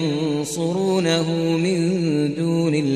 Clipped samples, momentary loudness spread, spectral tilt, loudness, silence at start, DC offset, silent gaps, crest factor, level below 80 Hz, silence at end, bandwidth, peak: under 0.1%; 4 LU; -6 dB/octave; -21 LUFS; 0 s; 0.1%; none; 14 dB; -66 dBFS; 0 s; 13.5 kHz; -6 dBFS